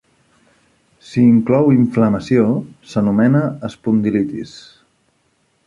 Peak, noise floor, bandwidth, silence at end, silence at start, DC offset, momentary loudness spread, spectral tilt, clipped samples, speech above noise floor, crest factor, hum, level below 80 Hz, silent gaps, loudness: -2 dBFS; -62 dBFS; 7.6 kHz; 1.2 s; 1.1 s; under 0.1%; 11 LU; -8.5 dB/octave; under 0.1%; 47 dB; 14 dB; none; -52 dBFS; none; -16 LUFS